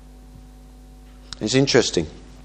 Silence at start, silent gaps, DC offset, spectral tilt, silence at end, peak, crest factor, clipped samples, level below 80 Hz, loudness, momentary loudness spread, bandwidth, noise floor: 0.1 s; none; under 0.1%; -4 dB/octave; 0 s; -2 dBFS; 22 dB; under 0.1%; -44 dBFS; -20 LUFS; 17 LU; 10.5 kHz; -44 dBFS